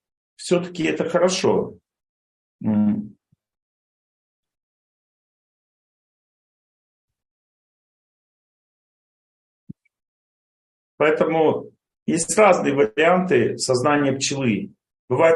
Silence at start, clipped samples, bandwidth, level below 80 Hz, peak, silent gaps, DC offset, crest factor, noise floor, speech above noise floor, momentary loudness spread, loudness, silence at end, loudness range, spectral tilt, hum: 0.4 s; under 0.1%; 12 kHz; -66 dBFS; -2 dBFS; 2.09-2.59 s, 3.62-4.43 s, 4.63-7.08 s, 7.31-9.67 s, 10.08-10.98 s, 12.02-12.06 s, 14.99-15.08 s; under 0.1%; 20 dB; under -90 dBFS; over 71 dB; 13 LU; -20 LUFS; 0 s; 10 LU; -4.5 dB/octave; none